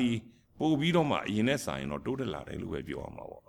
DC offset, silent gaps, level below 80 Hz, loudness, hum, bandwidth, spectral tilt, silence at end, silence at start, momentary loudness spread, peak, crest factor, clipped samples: under 0.1%; none; -56 dBFS; -32 LUFS; none; 17 kHz; -6 dB/octave; 0.1 s; 0 s; 12 LU; -14 dBFS; 18 dB; under 0.1%